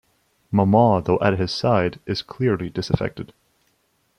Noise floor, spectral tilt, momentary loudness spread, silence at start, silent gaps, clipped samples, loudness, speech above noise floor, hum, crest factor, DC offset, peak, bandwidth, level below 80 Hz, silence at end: -66 dBFS; -7.5 dB/octave; 12 LU; 0.5 s; none; under 0.1%; -21 LUFS; 46 dB; none; 18 dB; under 0.1%; -2 dBFS; 11 kHz; -48 dBFS; 0.95 s